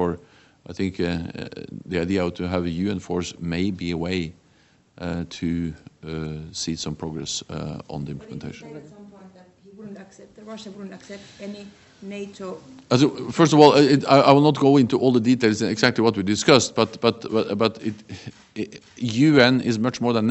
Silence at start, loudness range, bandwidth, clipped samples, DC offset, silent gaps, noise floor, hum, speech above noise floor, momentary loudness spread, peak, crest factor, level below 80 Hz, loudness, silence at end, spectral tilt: 0 s; 21 LU; 8.4 kHz; under 0.1%; under 0.1%; none; -58 dBFS; none; 37 dB; 22 LU; 0 dBFS; 22 dB; -52 dBFS; -21 LUFS; 0 s; -5.5 dB/octave